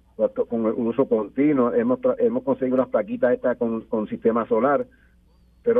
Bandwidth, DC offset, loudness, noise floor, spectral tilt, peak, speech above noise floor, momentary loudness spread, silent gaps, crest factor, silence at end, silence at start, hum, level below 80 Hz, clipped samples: 3.7 kHz; under 0.1%; -22 LUFS; -56 dBFS; -10.5 dB/octave; -6 dBFS; 35 dB; 5 LU; none; 16 dB; 0 s; 0.2 s; none; -58 dBFS; under 0.1%